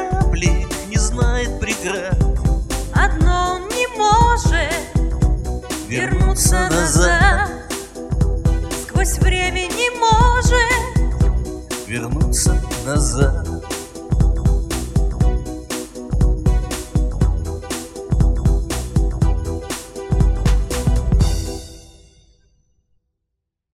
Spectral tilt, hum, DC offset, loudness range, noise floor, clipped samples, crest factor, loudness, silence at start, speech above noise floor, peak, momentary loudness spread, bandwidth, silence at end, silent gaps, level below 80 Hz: -4.5 dB/octave; none; under 0.1%; 4 LU; -77 dBFS; under 0.1%; 16 dB; -19 LUFS; 0 s; 61 dB; 0 dBFS; 11 LU; 14.5 kHz; 1.95 s; none; -20 dBFS